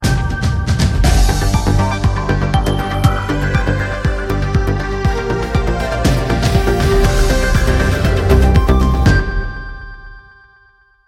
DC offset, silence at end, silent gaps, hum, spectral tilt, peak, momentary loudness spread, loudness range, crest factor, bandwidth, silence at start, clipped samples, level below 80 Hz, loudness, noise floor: under 0.1%; 0.85 s; none; none; -6 dB/octave; 0 dBFS; 6 LU; 3 LU; 14 dB; 16 kHz; 0 s; under 0.1%; -18 dBFS; -15 LUFS; -51 dBFS